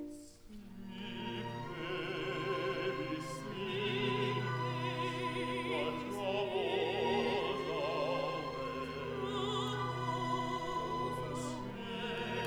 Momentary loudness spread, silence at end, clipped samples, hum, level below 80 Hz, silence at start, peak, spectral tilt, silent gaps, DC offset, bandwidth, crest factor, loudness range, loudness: 8 LU; 0 s; under 0.1%; none; -62 dBFS; 0 s; -22 dBFS; -5.5 dB/octave; none; under 0.1%; over 20 kHz; 16 dB; 3 LU; -37 LUFS